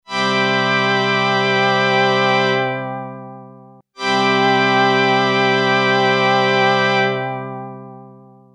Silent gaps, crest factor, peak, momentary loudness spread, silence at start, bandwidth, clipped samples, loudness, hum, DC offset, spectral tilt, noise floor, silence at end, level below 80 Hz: none; 14 dB; -2 dBFS; 14 LU; 0.1 s; 10 kHz; under 0.1%; -15 LUFS; none; under 0.1%; -4.5 dB/octave; -43 dBFS; 0.45 s; -70 dBFS